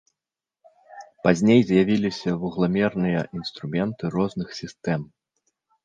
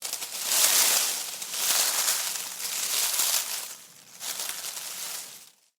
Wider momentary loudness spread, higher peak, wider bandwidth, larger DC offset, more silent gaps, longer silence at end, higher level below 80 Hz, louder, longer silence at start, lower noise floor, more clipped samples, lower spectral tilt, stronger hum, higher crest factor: about the same, 14 LU vs 15 LU; first, -2 dBFS vs -6 dBFS; second, 9.2 kHz vs over 20 kHz; neither; neither; first, 0.8 s vs 0.35 s; first, -56 dBFS vs under -90 dBFS; about the same, -23 LUFS vs -25 LUFS; first, 0.9 s vs 0 s; first, -89 dBFS vs -50 dBFS; neither; first, -7 dB/octave vs 3 dB/octave; neither; about the same, 22 dB vs 22 dB